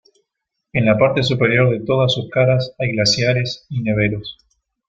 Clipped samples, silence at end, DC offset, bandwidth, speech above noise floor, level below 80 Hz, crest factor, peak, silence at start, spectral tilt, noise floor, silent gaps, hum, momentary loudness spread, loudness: under 0.1%; 0.55 s; under 0.1%; 7.6 kHz; 61 dB; -48 dBFS; 16 dB; -2 dBFS; 0.75 s; -5.5 dB/octave; -78 dBFS; none; none; 9 LU; -17 LUFS